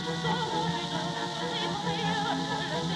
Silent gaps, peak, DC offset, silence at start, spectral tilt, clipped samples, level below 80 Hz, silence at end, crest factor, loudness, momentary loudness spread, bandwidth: none; -16 dBFS; under 0.1%; 0 s; -4.5 dB/octave; under 0.1%; -58 dBFS; 0 s; 14 dB; -30 LUFS; 3 LU; 12 kHz